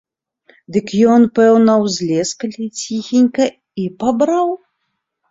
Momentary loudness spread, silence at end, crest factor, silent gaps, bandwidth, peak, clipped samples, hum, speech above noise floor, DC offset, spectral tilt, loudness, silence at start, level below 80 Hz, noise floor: 13 LU; 0.75 s; 14 dB; none; 7.8 kHz; -2 dBFS; under 0.1%; none; 58 dB; under 0.1%; -5.5 dB/octave; -15 LUFS; 0.7 s; -58 dBFS; -72 dBFS